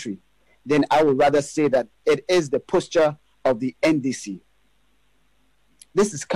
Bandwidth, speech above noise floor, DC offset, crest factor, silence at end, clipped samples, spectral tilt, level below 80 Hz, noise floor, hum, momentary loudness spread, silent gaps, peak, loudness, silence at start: 14 kHz; 45 dB; 0.2%; 12 dB; 0 s; under 0.1%; -5 dB/octave; -56 dBFS; -66 dBFS; none; 12 LU; none; -10 dBFS; -21 LUFS; 0 s